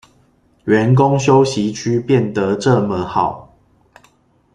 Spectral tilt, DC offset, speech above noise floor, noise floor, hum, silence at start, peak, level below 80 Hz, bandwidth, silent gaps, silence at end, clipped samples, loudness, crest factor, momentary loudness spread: -6.5 dB/octave; under 0.1%; 41 dB; -55 dBFS; none; 0.65 s; -2 dBFS; -50 dBFS; 10 kHz; none; 1.1 s; under 0.1%; -15 LUFS; 14 dB; 8 LU